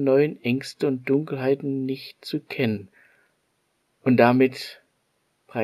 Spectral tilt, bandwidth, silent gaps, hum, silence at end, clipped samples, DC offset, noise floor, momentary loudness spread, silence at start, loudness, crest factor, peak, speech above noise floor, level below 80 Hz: -7 dB/octave; 14.5 kHz; none; none; 0 s; under 0.1%; under 0.1%; -71 dBFS; 15 LU; 0 s; -24 LUFS; 22 dB; -2 dBFS; 48 dB; -72 dBFS